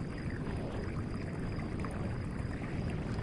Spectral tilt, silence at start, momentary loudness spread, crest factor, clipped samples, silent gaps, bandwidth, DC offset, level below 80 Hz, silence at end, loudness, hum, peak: -7.5 dB/octave; 0 s; 1 LU; 12 dB; under 0.1%; none; 11.5 kHz; under 0.1%; -46 dBFS; 0 s; -39 LUFS; none; -24 dBFS